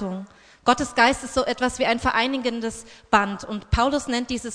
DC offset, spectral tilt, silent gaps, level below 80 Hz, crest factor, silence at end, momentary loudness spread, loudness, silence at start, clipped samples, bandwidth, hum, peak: under 0.1%; -4 dB/octave; none; -40 dBFS; 20 dB; 0 s; 13 LU; -23 LUFS; 0 s; under 0.1%; 10.5 kHz; none; -2 dBFS